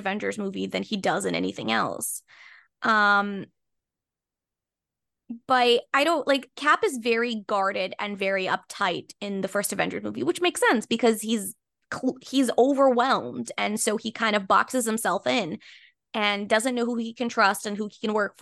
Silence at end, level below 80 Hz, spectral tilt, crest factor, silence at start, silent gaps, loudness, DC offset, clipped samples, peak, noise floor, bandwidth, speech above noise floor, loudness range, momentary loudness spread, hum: 0.1 s; -74 dBFS; -3.5 dB/octave; 20 dB; 0 s; none; -25 LUFS; under 0.1%; under 0.1%; -6 dBFS; -89 dBFS; 12.5 kHz; 64 dB; 3 LU; 10 LU; none